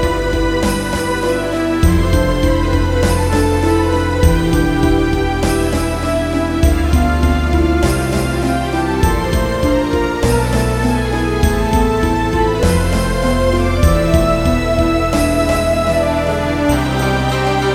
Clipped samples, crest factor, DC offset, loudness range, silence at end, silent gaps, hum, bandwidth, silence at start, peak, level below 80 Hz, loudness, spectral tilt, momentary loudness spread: under 0.1%; 14 dB; under 0.1%; 1 LU; 0 s; none; none; 16 kHz; 0 s; 0 dBFS; -20 dBFS; -15 LUFS; -6 dB/octave; 3 LU